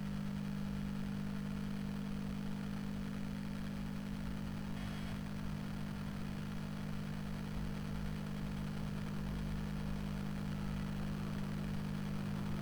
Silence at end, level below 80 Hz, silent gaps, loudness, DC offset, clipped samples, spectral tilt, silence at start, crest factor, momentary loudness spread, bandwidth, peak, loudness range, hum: 0 s; -50 dBFS; none; -42 LUFS; 0.2%; under 0.1%; -7 dB/octave; 0 s; 12 dB; 2 LU; over 20 kHz; -28 dBFS; 2 LU; 50 Hz at -45 dBFS